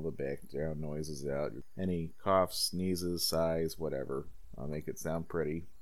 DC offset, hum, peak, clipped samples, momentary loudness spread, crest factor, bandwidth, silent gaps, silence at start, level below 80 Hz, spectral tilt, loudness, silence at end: 0.6%; none; -16 dBFS; under 0.1%; 10 LU; 20 dB; 17 kHz; none; 0 s; -54 dBFS; -5 dB/octave; -35 LUFS; 0 s